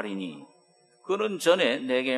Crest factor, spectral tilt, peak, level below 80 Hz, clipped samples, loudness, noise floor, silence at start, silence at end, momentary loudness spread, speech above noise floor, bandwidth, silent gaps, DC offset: 20 dB; -4 dB/octave; -8 dBFS; -82 dBFS; under 0.1%; -26 LUFS; -62 dBFS; 0 s; 0 s; 21 LU; 36 dB; 12.5 kHz; none; under 0.1%